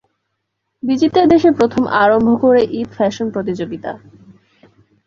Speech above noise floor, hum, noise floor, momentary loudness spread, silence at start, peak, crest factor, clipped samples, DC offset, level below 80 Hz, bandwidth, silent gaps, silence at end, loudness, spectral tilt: 59 dB; none; -73 dBFS; 14 LU; 0.85 s; -2 dBFS; 14 dB; under 0.1%; under 0.1%; -50 dBFS; 7.4 kHz; none; 1.1 s; -14 LUFS; -6.5 dB/octave